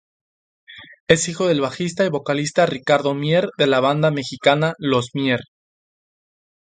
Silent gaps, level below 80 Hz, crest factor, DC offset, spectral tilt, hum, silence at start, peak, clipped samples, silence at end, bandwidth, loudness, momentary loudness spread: 1.00-1.07 s; -58 dBFS; 20 dB; under 0.1%; -5 dB/octave; none; 0.7 s; 0 dBFS; under 0.1%; 1.25 s; 9.6 kHz; -19 LUFS; 5 LU